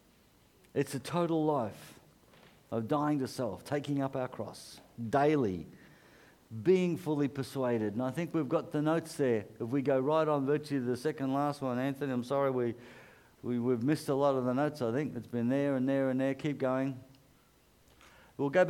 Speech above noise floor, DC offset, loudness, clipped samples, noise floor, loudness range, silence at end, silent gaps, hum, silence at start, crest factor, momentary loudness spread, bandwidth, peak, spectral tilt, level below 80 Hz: 33 dB; under 0.1%; -32 LUFS; under 0.1%; -65 dBFS; 3 LU; 0 s; none; none; 0.75 s; 18 dB; 10 LU; 16.5 kHz; -14 dBFS; -7 dB/octave; -72 dBFS